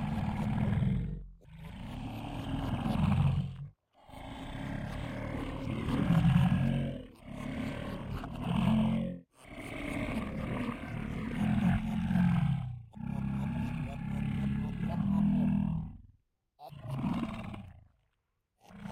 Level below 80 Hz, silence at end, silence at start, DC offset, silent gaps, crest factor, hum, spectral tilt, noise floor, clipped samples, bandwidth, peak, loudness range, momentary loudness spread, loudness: -46 dBFS; 0 s; 0 s; under 0.1%; none; 20 dB; none; -8 dB/octave; -81 dBFS; under 0.1%; 15 kHz; -14 dBFS; 3 LU; 17 LU; -33 LUFS